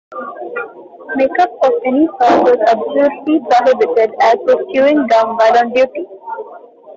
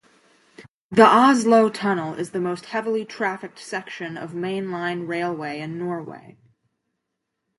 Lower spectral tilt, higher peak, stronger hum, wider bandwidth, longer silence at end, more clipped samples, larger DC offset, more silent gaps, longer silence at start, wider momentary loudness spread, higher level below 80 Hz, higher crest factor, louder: about the same, -5 dB/octave vs -5.5 dB/octave; about the same, -2 dBFS vs -2 dBFS; neither; second, 7.6 kHz vs 11.5 kHz; second, 0.05 s vs 1.4 s; neither; neither; second, none vs 0.70-0.89 s; second, 0.1 s vs 0.6 s; about the same, 16 LU vs 16 LU; first, -58 dBFS vs -70 dBFS; second, 10 dB vs 20 dB; first, -12 LUFS vs -22 LUFS